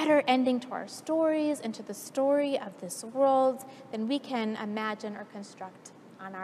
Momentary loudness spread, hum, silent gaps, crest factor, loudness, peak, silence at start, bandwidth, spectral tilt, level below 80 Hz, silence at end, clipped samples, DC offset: 19 LU; none; none; 18 dB; -29 LUFS; -12 dBFS; 0 s; 14.5 kHz; -4.5 dB/octave; -88 dBFS; 0 s; under 0.1%; under 0.1%